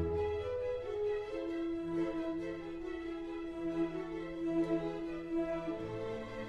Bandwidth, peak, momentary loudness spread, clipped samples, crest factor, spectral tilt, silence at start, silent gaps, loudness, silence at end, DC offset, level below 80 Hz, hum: 8 kHz; -24 dBFS; 6 LU; under 0.1%; 14 dB; -7.5 dB/octave; 0 s; none; -38 LUFS; 0 s; under 0.1%; -56 dBFS; none